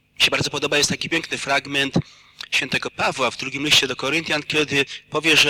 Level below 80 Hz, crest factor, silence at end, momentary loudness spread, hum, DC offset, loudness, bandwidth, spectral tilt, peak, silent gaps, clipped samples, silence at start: -52 dBFS; 18 dB; 0 s; 7 LU; none; under 0.1%; -20 LUFS; 19 kHz; -2.5 dB/octave; -4 dBFS; none; under 0.1%; 0.2 s